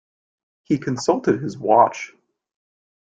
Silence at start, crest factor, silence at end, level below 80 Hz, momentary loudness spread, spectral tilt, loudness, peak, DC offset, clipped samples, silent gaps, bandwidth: 0.7 s; 20 dB; 1.15 s; -62 dBFS; 12 LU; -6 dB/octave; -20 LUFS; -2 dBFS; under 0.1%; under 0.1%; none; 9.2 kHz